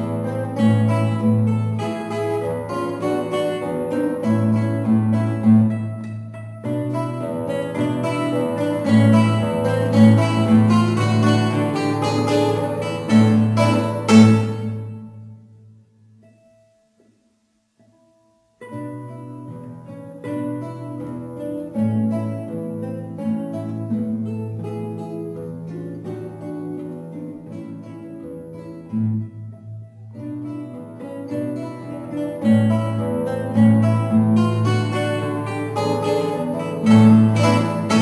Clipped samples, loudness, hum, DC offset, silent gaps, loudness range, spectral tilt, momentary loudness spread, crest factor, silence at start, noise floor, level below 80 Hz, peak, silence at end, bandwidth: under 0.1%; -19 LUFS; none; under 0.1%; none; 15 LU; -7.5 dB/octave; 19 LU; 18 dB; 0 s; -65 dBFS; -60 dBFS; 0 dBFS; 0 s; 11 kHz